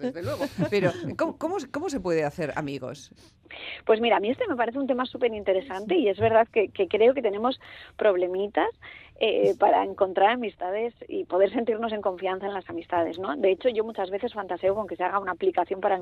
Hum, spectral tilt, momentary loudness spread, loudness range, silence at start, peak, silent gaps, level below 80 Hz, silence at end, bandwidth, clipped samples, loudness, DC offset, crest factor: none; -6 dB/octave; 10 LU; 4 LU; 0 s; -8 dBFS; none; -60 dBFS; 0 s; 14 kHz; under 0.1%; -26 LUFS; under 0.1%; 18 dB